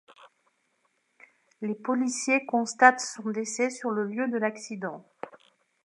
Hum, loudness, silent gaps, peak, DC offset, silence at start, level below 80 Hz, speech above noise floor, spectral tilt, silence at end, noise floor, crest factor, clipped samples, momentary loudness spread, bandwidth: none; -27 LUFS; none; -4 dBFS; under 0.1%; 0.2 s; -86 dBFS; 46 dB; -3.5 dB/octave; 0.55 s; -73 dBFS; 26 dB; under 0.1%; 18 LU; 11.5 kHz